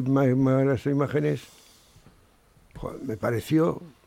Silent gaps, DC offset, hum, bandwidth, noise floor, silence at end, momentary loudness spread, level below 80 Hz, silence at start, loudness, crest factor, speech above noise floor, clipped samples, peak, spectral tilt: none; under 0.1%; none; 16 kHz; -59 dBFS; 0.2 s; 13 LU; -54 dBFS; 0 s; -25 LUFS; 14 dB; 34 dB; under 0.1%; -12 dBFS; -8 dB/octave